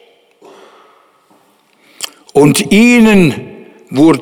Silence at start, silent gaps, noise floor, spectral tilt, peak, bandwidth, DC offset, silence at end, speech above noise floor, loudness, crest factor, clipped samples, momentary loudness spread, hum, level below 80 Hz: 2 s; none; -51 dBFS; -5.5 dB/octave; 0 dBFS; 17.5 kHz; under 0.1%; 0 s; 44 dB; -9 LUFS; 12 dB; under 0.1%; 19 LU; none; -42 dBFS